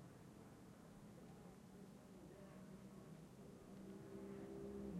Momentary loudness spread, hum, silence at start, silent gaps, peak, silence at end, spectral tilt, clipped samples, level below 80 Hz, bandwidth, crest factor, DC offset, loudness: 8 LU; none; 0 s; none; -40 dBFS; 0 s; -7 dB/octave; under 0.1%; -74 dBFS; 15 kHz; 16 dB; under 0.1%; -59 LUFS